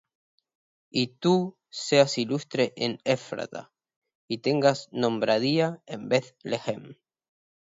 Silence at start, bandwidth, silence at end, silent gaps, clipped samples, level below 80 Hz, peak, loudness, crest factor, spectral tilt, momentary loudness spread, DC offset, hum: 0.95 s; 7.8 kHz; 0.8 s; 3.96-4.02 s, 4.15-4.28 s; under 0.1%; -72 dBFS; -6 dBFS; -26 LUFS; 22 dB; -5 dB/octave; 12 LU; under 0.1%; none